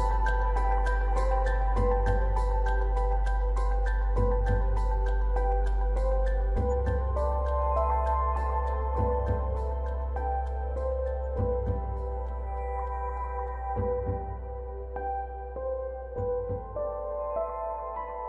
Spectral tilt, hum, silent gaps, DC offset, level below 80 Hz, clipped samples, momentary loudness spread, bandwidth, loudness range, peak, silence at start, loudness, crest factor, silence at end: -8.5 dB/octave; none; none; under 0.1%; -28 dBFS; under 0.1%; 7 LU; 4.5 kHz; 5 LU; -14 dBFS; 0 s; -30 LUFS; 14 dB; 0 s